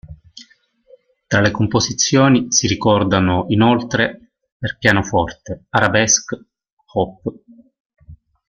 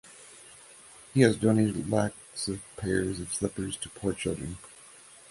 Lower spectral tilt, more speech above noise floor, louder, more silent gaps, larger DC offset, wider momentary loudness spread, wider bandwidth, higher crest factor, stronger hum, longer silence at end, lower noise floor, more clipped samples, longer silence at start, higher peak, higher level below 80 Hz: second, -4 dB/octave vs -5.5 dB/octave; first, 38 dB vs 24 dB; first, -16 LUFS vs -29 LUFS; first, 4.52-4.60 s, 6.72-6.77 s, 7.80-7.90 s vs none; neither; second, 14 LU vs 25 LU; second, 10 kHz vs 11.5 kHz; second, 18 dB vs 24 dB; neither; about the same, 0.35 s vs 0.45 s; about the same, -54 dBFS vs -52 dBFS; neither; about the same, 0.05 s vs 0.05 s; first, 0 dBFS vs -6 dBFS; first, -46 dBFS vs -54 dBFS